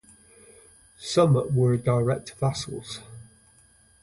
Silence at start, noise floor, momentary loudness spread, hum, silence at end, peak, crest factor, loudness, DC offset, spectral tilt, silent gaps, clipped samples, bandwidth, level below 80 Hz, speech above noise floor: 1 s; -58 dBFS; 18 LU; none; 0.8 s; -6 dBFS; 20 dB; -24 LUFS; under 0.1%; -6.5 dB/octave; none; under 0.1%; 11.5 kHz; -56 dBFS; 35 dB